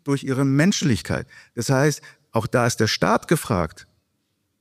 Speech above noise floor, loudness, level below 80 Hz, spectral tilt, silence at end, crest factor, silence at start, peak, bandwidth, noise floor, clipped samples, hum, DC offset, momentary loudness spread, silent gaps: 51 dB; -21 LUFS; -50 dBFS; -5 dB/octave; 0.8 s; 16 dB; 0.05 s; -6 dBFS; 15.5 kHz; -72 dBFS; under 0.1%; none; under 0.1%; 11 LU; none